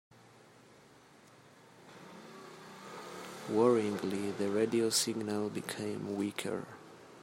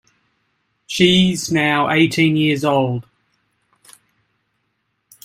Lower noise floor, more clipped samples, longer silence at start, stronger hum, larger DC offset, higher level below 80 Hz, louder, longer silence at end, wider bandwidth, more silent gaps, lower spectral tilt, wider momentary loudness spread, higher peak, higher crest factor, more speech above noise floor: second, -60 dBFS vs -70 dBFS; neither; first, 1.4 s vs 0.9 s; neither; neither; second, -80 dBFS vs -54 dBFS; second, -34 LUFS vs -16 LUFS; second, 0 s vs 2.25 s; about the same, 16 kHz vs 15.5 kHz; neither; about the same, -4 dB/octave vs -5 dB/octave; first, 22 LU vs 9 LU; second, -16 dBFS vs 0 dBFS; about the same, 20 dB vs 18 dB; second, 27 dB vs 55 dB